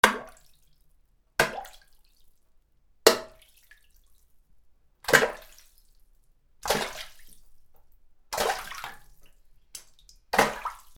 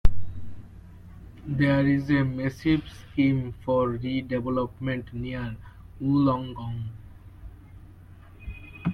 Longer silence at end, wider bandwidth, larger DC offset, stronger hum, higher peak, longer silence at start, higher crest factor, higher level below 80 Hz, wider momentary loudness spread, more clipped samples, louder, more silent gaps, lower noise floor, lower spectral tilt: first, 0.2 s vs 0 s; first, over 20 kHz vs 6.4 kHz; neither; neither; about the same, -2 dBFS vs -4 dBFS; about the same, 0.05 s vs 0.05 s; first, 30 dB vs 22 dB; second, -56 dBFS vs -38 dBFS; about the same, 24 LU vs 24 LU; neither; about the same, -26 LUFS vs -27 LUFS; neither; first, -63 dBFS vs -48 dBFS; second, -2 dB/octave vs -8.5 dB/octave